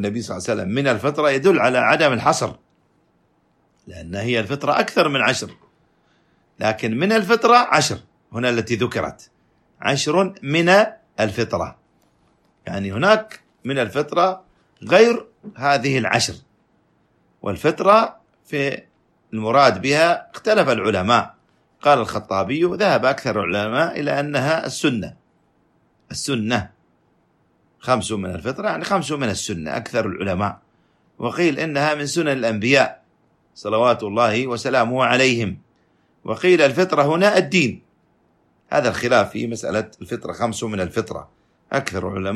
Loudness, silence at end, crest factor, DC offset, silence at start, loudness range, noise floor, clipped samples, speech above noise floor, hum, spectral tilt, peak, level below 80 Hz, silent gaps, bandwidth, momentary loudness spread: -19 LUFS; 0 s; 18 dB; under 0.1%; 0 s; 5 LU; -62 dBFS; under 0.1%; 43 dB; none; -4.5 dB/octave; -2 dBFS; -56 dBFS; none; 13.5 kHz; 13 LU